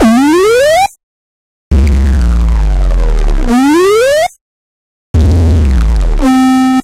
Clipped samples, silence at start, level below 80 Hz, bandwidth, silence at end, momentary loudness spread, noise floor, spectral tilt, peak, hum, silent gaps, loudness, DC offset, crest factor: under 0.1%; 0 s; -12 dBFS; 15.5 kHz; 0 s; 7 LU; under -90 dBFS; -6.5 dB/octave; 0 dBFS; none; 1.03-1.71 s, 4.41-5.14 s; -10 LUFS; under 0.1%; 8 dB